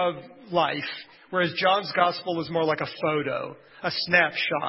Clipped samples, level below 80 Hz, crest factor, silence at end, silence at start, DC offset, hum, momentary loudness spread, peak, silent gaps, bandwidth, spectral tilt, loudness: under 0.1%; -68 dBFS; 20 dB; 0 s; 0 s; under 0.1%; none; 12 LU; -6 dBFS; none; 5.8 kHz; -8.5 dB/octave; -25 LUFS